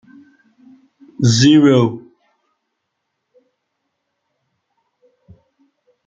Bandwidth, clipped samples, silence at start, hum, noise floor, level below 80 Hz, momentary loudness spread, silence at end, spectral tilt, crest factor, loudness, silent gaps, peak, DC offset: 9 kHz; under 0.1%; 1.2 s; none; -74 dBFS; -56 dBFS; 11 LU; 4.1 s; -5.5 dB/octave; 18 dB; -13 LUFS; none; -2 dBFS; under 0.1%